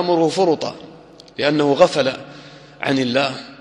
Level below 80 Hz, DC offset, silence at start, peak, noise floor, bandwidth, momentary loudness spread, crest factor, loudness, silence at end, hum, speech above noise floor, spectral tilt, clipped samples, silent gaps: -60 dBFS; under 0.1%; 0 s; 0 dBFS; -40 dBFS; 11.5 kHz; 19 LU; 18 dB; -18 LUFS; 0.05 s; none; 23 dB; -5 dB/octave; under 0.1%; none